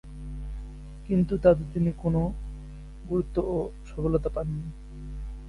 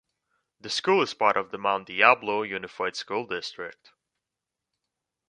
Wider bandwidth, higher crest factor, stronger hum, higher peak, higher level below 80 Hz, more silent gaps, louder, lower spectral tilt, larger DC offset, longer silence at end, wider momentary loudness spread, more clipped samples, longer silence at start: about the same, 11 kHz vs 10.5 kHz; about the same, 22 dB vs 26 dB; neither; second, -6 dBFS vs -2 dBFS; first, -38 dBFS vs -72 dBFS; neither; about the same, -27 LUFS vs -25 LUFS; first, -10 dB/octave vs -3 dB/octave; neither; second, 0 s vs 1.55 s; first, 21 LU vs 15 LU; neither; second, 0.05 s vs 0.65 s